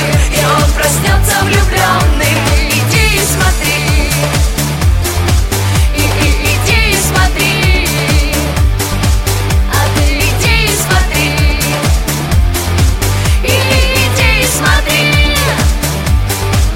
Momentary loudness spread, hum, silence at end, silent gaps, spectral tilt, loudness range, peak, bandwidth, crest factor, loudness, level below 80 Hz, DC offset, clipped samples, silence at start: 4 LU; none; 0 s; none; -4 dB/octave; 1 LU; 0 dBFS; 16.5 kHz; 10 dB; -11 LUFS; -14 dBFS; under 0.1%; under 0.1%; 0 s